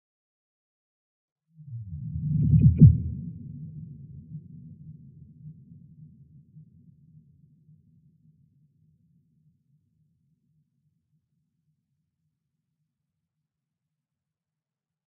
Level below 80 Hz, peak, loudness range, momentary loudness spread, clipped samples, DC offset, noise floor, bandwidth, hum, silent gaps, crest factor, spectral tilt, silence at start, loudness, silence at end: -44 dBFS; -4 dBFS; 24 LU; 31 LU; under 0.1%; under 0.1%; -89 dBFS; 0.6 kHz; none; none; 26 dB; -19 dB/octave; 1.7 s; -21 LUFS; 9.55 s